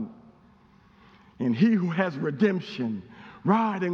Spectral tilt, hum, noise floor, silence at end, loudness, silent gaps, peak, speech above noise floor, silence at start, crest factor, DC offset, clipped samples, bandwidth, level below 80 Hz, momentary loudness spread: -8.5 dB/octave; none; -57 dBFS; 0 s; -26 LUFS; none; -6 dBFS; 32 dB; 0 s; 20 dB; under 0.1%; under 0.1%; 6.6 kHz; -68 dBFS; 13 LU